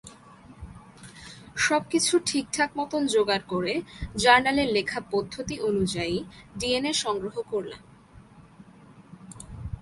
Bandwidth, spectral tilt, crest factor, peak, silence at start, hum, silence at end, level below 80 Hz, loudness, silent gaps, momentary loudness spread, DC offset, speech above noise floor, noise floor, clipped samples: 11.5 kHz; -3 dB/octave; 24 dB; -4 dBFS; 0.05 s; none; 0 s; -50 dBFS; -25 LUFS; none; 22 LU; under 0.1%; 26 dB; -51 dBFS; under 0.1%